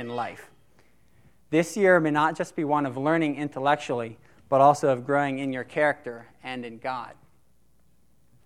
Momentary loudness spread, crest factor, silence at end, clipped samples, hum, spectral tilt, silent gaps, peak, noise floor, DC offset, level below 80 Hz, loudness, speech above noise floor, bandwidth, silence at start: 16 LU; 20 dB; 1.35 s; under 0.1%; none; -6 dB/octave; none; -6 dBFS; -66 dBFS; 0.1%; -68 dBFS; -25 LUFS; 41 dB; 14.5 kHz; 0 s